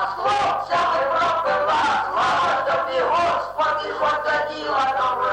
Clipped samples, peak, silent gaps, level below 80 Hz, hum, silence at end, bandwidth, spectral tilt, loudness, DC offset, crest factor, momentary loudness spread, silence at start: under 0.1%; -12 dBFS; none; -56 dBFS; none; 0 s; 16 kHz; -3 dB/octave; -20 LUFS; under 0.1%; 10 dB; 3 LU; 0 s